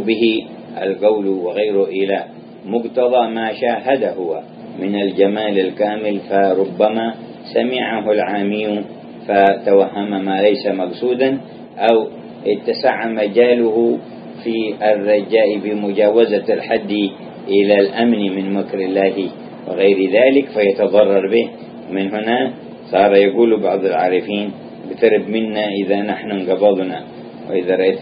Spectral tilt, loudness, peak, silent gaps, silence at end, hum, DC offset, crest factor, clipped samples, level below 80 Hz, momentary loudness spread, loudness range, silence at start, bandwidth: -9.5 dB/octave; -16 LUFS; 0 dBFS; none; 0 s; none; under 0.1%; 16 dB; under 0.1%; -64 dBFS; 12 LU; 3 LU; 0 s; 5.2 kHz